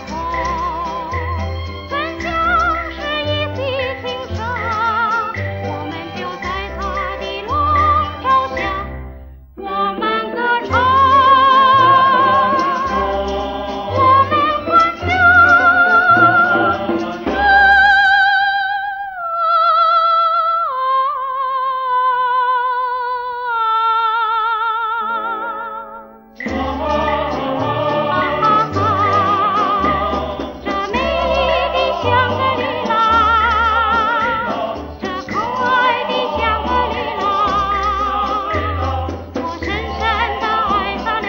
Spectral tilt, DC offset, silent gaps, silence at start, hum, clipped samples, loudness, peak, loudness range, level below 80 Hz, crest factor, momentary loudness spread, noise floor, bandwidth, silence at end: -5.5 dB/octave; under 0.1%; none; 0 s; none; under 0.1%; -15 LUFS; 0 dBFS; 8 LU; -36 dBFS; 16 dB; 13 LU; -36 dBFS; 16 kHz; 0 s